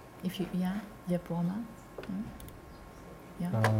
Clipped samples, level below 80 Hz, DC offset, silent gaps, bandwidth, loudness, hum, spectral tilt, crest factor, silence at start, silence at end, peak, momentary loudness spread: under 0.1%; -56 dBFS; under 0.1%; none; 16.5 kHz; -36 LUFS; none; -7 dB/octave; 24 dB; 0 s; 0 s; -12 dBFS; 17 LU